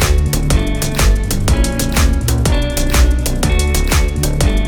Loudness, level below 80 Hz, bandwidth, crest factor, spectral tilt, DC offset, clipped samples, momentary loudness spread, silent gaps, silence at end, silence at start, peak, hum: -15 LUFS; -14 dBFS; over 20 kHz; 12 dB; -4.5 dB/octave; under 0.1%; under 0.1%; 2 LU; none; 0 s; 0 s; -2 dBFS; none